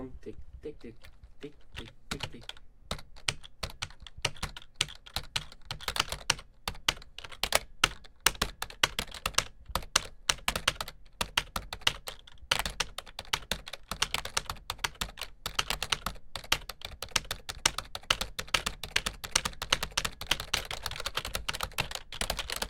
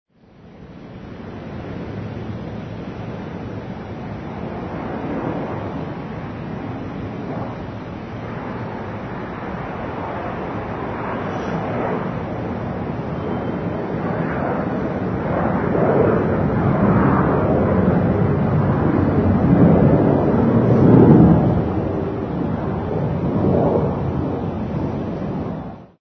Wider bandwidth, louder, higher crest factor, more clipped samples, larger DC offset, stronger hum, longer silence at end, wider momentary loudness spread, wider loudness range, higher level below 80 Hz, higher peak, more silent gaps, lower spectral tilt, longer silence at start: first, 18 kHz vs 6.2 kHz; second, -32 LUFS vs -20 LUFS; first, 34 dB vs 20 dB; neither; neither; neither; second, 0 s vs 0.15 s; about the same, 14 LU vs 16 LU; second, 7 LU vs 14 LU; second, -48 dBFS vs -36 dBFS; about the same, -2 dBFS vs 0 dBFS; neither; second, -1 dB/octave vs -10.5 dB/octave; second, 0 s vs 0.45 s